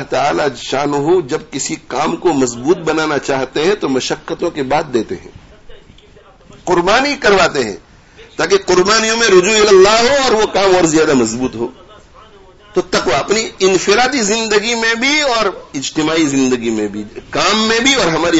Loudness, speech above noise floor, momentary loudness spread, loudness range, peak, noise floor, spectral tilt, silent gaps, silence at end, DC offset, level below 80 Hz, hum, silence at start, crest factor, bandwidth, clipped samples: -13 LUFS; 30 dB; 11 LU; 7 LU; 0 dBFS; -43 dBFS; -3 dB/octave; none; 0 s; under 0.1%; -42 dBFS; none; 0 s; 14 dB; 8 kHz; under 0.1%